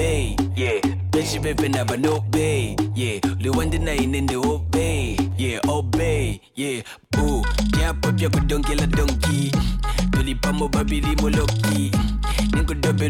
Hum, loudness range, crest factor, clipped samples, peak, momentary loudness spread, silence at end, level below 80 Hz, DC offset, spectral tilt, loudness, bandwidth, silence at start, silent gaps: none; 1 LU; 12 dB; under 0.1%; -10 dBFS; 3 LU; 0 s; -26 dBFS; under 0.1%; -5.5 dB/octave; -22 LUFS; 17 kHz; 0 s; none